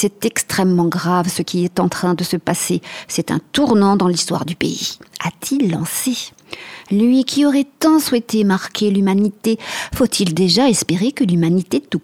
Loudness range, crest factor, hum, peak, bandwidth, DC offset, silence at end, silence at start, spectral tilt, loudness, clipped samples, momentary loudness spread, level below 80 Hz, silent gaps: 2 LU; 16 dB; none; -2 dBFS; 17 kHz; under 0.1%; 0.05 s; 0 s; -5 dB/octave; -17 LUFS; under 0.1%; 9 LU; -48 dBFS; none